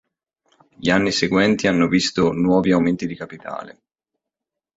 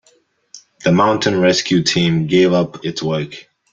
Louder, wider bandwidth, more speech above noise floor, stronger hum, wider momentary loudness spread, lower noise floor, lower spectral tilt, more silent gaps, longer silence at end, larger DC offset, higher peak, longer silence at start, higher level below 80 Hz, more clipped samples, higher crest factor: second, -18 LUFS vs -15 LUFS; about the same, 8 kHz vs 7.8 kHz; first, 66 dB vs 42 dB; neither; first, 15 LU vs 9 LU; first, -85 dBFS vs -57 dBFS; about the same, -5 dB/octave vs -5 dB/octave; neither; first, 1.05 s vs 0.3 s; neither; about the same, -2 dBFS vs -2 dBFS; first, 0.8 s vs 0.55 s; about the same, -50 dBFS vs -52 dBFS; neither; about the same, 18 dB vs 16 dB